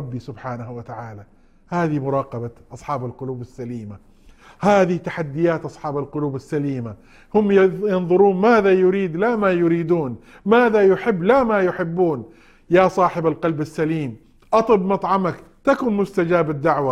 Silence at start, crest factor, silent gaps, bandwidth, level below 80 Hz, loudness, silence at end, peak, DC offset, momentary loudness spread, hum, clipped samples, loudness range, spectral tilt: 0 s; 18 dB; none; 11 kHz; -52 dBFS; -19 LUFS; 0 s; -2 dBFS; under 0.1%; 16 LU; none; under 0.1%; 10 LU; -8 dB/octave